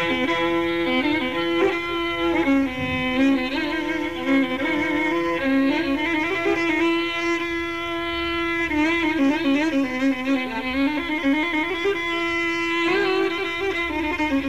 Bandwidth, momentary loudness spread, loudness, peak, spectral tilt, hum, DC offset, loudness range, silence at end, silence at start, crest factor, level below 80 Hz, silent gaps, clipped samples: 14.5 kHz; 4 LU; -22 LUFS; -10 dBFS; -4.5 dB/octave; none; 0.6%; 1 LU; 0 s; 0 s; 12 dB; -48 dBFS; none; under 0.1%